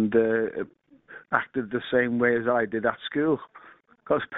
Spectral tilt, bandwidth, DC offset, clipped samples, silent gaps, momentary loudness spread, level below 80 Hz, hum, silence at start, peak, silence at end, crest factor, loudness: -4 dB/octave; 4 kHz; under 0.1%; under 0.1%; none; 8 LU; -62 dBFS; none; 0 s; -6 dBFS; 0 s; 20 dB; -26 LUFS